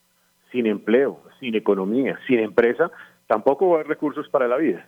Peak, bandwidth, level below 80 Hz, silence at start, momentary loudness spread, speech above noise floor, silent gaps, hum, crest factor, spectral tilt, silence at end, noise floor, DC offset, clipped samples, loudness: -6 dBFS; 6 kHz; -68 dBFS; 0.55 s; 7 LU; 42 dB; none; none; 16 dB; -7.5 dB/octave; 0.05 s; -63 dBFS; under 0.1%; under 0.1%; -21 LUFS